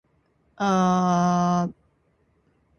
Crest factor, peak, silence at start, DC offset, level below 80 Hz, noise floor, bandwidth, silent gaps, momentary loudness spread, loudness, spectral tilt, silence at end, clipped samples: 16 dB; -10 dBFS; 0.6 s; under 0.1%; -58 dBFS; -66 dBFS; 6.8 kHz; none; 7 LU; -22 LUFS; -6.5 dB/octave; 1.1 s; under 0.1%